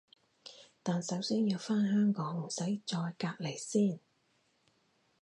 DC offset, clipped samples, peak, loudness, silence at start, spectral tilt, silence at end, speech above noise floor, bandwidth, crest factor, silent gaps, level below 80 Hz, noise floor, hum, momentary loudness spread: under 0.1%; under 0.1%; -18 dBFS; -34 LUFS; 0.45 s; -5.5 dB/octave; 1.25 s; 41 dB; 11 kHz; 16 dB; none; -82 dBFS; -74 dBFS; none; 18 LU